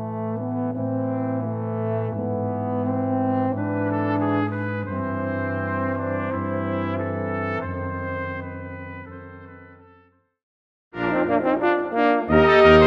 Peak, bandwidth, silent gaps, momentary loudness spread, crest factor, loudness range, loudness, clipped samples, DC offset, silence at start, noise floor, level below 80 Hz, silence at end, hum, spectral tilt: -2 dBFS; 7.2 kHz; 10.43-10.91 s; 13 LU; 20 dB; 7 LU; -23 LUFS; under 0.1%; under 0.1%; 0 s; -58 dBFS; -44 dBFS; 0 s; none; -8.5 dB/octave